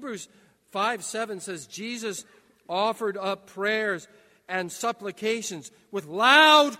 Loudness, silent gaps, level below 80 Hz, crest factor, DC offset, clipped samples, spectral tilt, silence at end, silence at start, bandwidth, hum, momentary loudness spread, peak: -25 LUFS; none; -80 dBFS; 24 dB; under 0.1%; under 0.1%; -2 dB/octave; 0 s; 0 s; 16 kHz; none; 18 LU; -2 dBFS